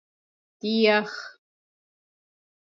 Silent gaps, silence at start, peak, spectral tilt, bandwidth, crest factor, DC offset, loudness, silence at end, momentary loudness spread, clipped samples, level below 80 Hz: none; 0.65 s; -8 dBFS; -5 dB/octave; 7.4 kHz; 20 dB; under 0.1%; -23 LUFS; 1.3 s; 18 LU; under 0.1%; -84 dBFS